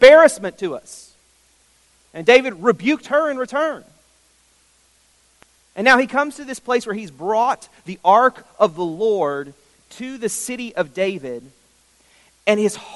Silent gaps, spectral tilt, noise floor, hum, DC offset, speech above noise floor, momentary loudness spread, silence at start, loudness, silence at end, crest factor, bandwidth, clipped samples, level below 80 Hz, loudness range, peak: none; -3.5 dB/octave; -58 dBFS; none; under 0.1%; 40 dB; 19 LU; 0 s; -18 LUFS; 0 s; 18 dB; 11.5 kHz; under 0.1%; -58 dBFS; 6 LU; 0 dBFS